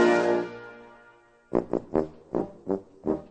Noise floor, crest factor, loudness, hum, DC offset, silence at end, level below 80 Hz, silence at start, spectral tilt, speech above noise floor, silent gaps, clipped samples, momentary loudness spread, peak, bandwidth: -57 dBFS; 20 dB; -29 LUFS; none; under 0.1%; 0.05 s; -54 dBFS; 0 s; -6.5 dB/octave; 27 dB; none; under 0.1%; 16 LU; -8 dBFS; 9 kHz